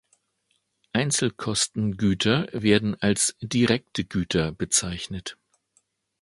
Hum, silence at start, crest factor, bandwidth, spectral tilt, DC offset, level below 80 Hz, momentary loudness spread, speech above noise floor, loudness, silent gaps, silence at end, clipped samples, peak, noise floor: none; 0.95 s; 22 dB; 12 kHz; -4 dB/octave; under 0.1%; -50 dBFS; 9 LU; 48 dB; -24 LUFS; none; 0.9 s; under 0.1%; -4 dBFS; -73 dBFS